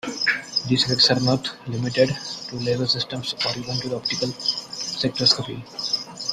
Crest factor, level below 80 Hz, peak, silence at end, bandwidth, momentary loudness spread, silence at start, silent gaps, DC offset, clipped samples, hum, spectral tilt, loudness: 22 dB; -56 dBFS; -2 dBFS; 0 s; 13.5 kHz; 12 LU; 0.05 s; none; under 0.1%; under 0.1%; none; -4 dB/octave; -22 LUFS